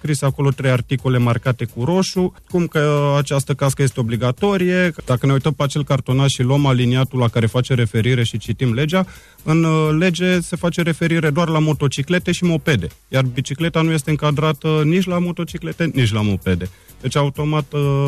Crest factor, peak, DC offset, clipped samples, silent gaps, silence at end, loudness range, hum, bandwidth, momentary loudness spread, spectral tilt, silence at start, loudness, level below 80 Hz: 12 dB; -6 dBFS; under 0.1%; under 0.1%; none; 0 s; 2 LU; none; 14 kHz; 5 LU; -6 dB/octave; 0.05 s; -18 LUFS; -44 dBFS